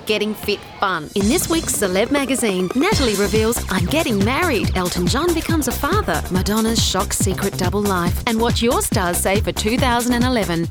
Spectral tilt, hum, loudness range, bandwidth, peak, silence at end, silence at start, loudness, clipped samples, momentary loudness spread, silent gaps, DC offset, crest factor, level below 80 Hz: -4 dB/octave; none; 1 LU; over 20 kHz; -2 dBFS; 0 s; 0 s; -18 LUFS; under 0.1%; 3 LU; none; under 0.1%; 16 dB; -32 dBFS